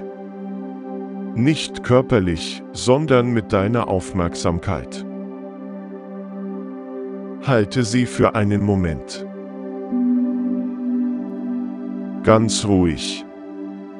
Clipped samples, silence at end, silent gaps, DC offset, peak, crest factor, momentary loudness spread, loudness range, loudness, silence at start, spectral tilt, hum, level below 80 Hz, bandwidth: under 0.1%; 0 s; none; under 0.1%; 0 dBFS; 20 dB; 16 LU; 6 LU; -21 LUFS; 0 s; -6 dB/octave; none; -46 dBFS; 12 kHz